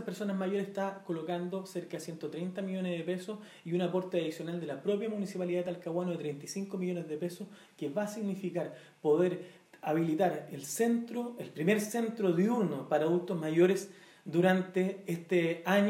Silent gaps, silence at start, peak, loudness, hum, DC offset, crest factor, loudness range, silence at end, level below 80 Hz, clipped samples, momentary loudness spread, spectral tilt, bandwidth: none; 0 s; -14 dBFS; -33 LUFS; none; under 0.1%; 20 dB; 6 LU; 0 s; -86 dBFS; under 0.1%; 12 LU; -6 dB/octave; 16 kHz